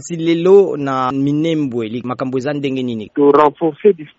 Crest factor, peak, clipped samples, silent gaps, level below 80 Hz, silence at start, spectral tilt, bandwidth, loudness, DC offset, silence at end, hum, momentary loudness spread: 14 dB; 0 dBFS; under 0.1%; none; -58 dBFS; 0 s; -6 dB/octave; 8 kHz; -15 LUFS; under 0.1%; 0.1 s; none; 11 LU